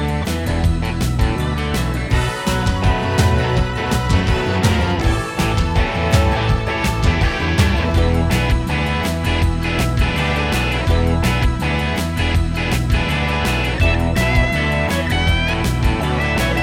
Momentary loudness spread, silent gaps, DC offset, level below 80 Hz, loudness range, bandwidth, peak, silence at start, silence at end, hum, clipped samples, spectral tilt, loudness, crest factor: 3 LU; none; under 0.1%; -22 dBFS; 1 LU; 17 kHz; -2 dBFS; 0 s; 0 s; none; under 0.1%; -5.5 dB/octave; -18 LUFS; 14 dB